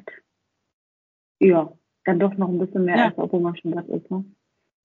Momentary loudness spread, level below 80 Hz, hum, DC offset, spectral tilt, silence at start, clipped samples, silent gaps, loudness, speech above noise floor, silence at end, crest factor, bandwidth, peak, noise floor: 13 LU; -70 dBFS; none; under 0.1%; -6.5 dB/octave; 0.05 s; under 0.1%; 0.73-1.35 s; -22 LUFS; 56 dB; 0.6 s; 18 dB; 4.3 kHz; -4 dBFS; -77 dBFS